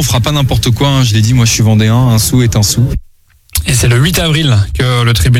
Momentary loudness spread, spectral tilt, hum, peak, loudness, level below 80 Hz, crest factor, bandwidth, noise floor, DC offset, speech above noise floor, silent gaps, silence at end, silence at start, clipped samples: 4 LU; -4.5 dB/octave; none; 0 dBFS; -10 LUFS; -24 dBFS; 8 dB; 16.5 kHz; -43 dBFS; under 0.1%; 34 dB; none; 0 s; 0 s; under 0.1%